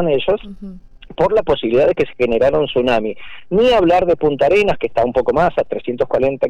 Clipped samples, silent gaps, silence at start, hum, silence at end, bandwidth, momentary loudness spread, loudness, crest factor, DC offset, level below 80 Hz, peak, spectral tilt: under 0.1%; none; 0 s; none; 0 s; 9.4 kHz; 9 LU; -16 LUFS; 10 dB; under 0.1%; -38 dBFS; -6 dBFS; -6.5 dB/octave